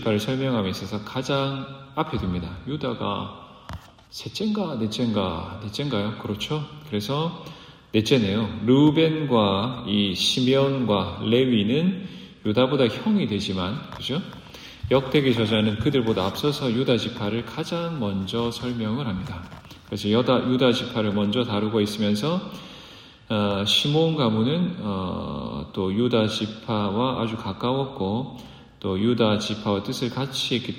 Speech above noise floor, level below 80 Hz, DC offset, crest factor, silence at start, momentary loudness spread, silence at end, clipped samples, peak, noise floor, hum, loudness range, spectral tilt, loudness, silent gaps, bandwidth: 22 dB; -52 dBFS; under 0.1%; 18 dB; 0 s; 13 LU; 0 s; under 0.1%; -6 dBFS; -46 dBFS; none; 7 LU; -6 dB/octave; -24 LUFS; none; 16 kHz